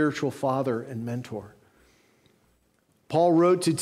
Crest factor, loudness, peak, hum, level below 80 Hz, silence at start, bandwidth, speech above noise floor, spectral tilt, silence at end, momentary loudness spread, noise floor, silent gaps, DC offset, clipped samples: 16 dB; -25 LUFS; -12 dBFS; none; -70 dBFS; 0 s; 14.5 kHz; 43 dB; -6 dB/octave; 0 s; 14 LU; -67 dBFS; none; under 0.1%; under 0.1%